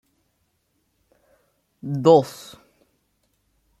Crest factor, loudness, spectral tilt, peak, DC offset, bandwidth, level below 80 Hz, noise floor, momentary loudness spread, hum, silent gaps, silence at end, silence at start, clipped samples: 22 dB; -19 LUFS; -7 dB/octave; -2 dBFS; under 0.1%; 14 kHz; -68 dBFS; -70 dBFS; 25 LU; none; none; 1.5 s; 1.85 s; under 0.1%